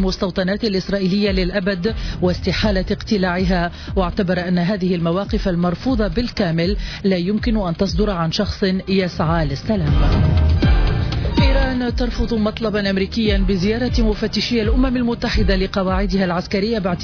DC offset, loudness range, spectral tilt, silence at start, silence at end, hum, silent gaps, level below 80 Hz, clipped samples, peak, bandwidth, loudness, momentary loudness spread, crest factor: under 0.1%; 2 LU; -7 dB/octave; 0 s; 0 s; none; none; -24 dBFS; under 0.1%; -6 dBFS; 5.4 kHz; -19 LUFS; 4 LU; 12 dB